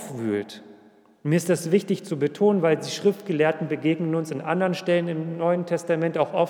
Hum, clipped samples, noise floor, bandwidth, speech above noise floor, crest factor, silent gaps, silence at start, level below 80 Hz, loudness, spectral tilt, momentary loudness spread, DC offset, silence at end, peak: none; under 0.1%; -54 dBFS; 18.5 kHz; 30 dB; 16 dB; none; 0 s; -82 dBFS; -24 LUFS; -6 dB/octave; 6 LU; under 0.1%; 0 s; -8 dBFS